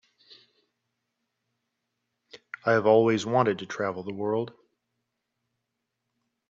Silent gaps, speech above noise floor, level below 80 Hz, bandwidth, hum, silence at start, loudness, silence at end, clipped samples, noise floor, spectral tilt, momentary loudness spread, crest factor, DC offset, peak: none; 58 dB; -74 dBFS; 7.8 kHz; none; 2.35 s; -25 LUFS; 2 s; under 0.1%; -82 dBFS; -6 dB/octave; 12 LU; 22 dB; under 0.1%; -6 dBFS